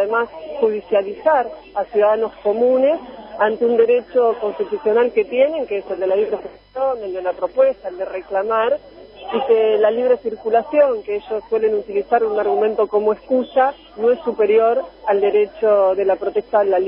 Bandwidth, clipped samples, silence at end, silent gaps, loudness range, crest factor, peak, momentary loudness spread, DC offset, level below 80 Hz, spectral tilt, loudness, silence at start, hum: 5.2 kHz; under 0.1%; 0 s; none; 3 LU; 16 dB; -2 dBFS; 9 LU; under 0.1%; -56 dBFS; -9 dB/octave; -18 LUFS; 0 s; none